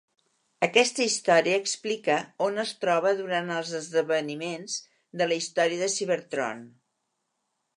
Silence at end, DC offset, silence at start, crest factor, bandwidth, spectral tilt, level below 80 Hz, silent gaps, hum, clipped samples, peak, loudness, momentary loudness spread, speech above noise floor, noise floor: 1.1 s; under 0.1%; 0.6 s; 24 dB; 11.5 kHz; -2.5 dB/octave; -82 dBFS; none; none; under 0.1%; -4 dBFS; -26 LUFS; 11 LU; 52 dB; -79 dBFS